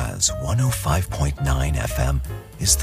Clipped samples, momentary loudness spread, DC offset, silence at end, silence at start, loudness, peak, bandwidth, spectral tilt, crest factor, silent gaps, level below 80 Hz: under 0.1%; 4 LU; under 0.1%; 0 s; 0 s; -22 LUFS; -4 dBFS; 15.5 kHz; -3.5 dB/octave; 18 dB; none; -28 dBFS